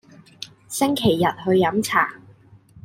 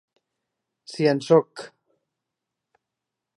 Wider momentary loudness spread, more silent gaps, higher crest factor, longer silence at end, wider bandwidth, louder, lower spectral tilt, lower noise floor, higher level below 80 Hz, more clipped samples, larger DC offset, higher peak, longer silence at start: about the same, 19 LU vs 21 LU; neither; about the same, 20 dB vs 22 dB; second, 0.05 s vs 1.7 s; first, 16 kHz vs 11 kHz; about the same, -20 LUFS vs -21 LUFS; second, -4.5 dB/octave vs -6.5 dB/octave; second, -50 dBFS vs -85 dBFS; first, -56 dBFS vs -82 dBFS; neither; neither; first, -2 dBFS vs -6 dBFS; second, 0.4 s vs 0.9 s